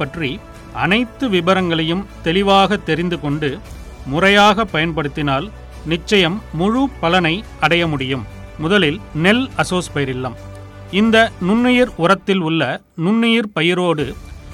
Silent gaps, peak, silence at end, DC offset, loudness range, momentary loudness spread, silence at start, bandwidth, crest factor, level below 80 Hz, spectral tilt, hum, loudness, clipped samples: none; -2 dBFS; 0 s; under 0.1%; 2 LU; 12 LU; 0 s; 15 kHz; 14 dB; -38 dBFS; -5.5 dB/octave; none; -16 LUFS; under 0.1%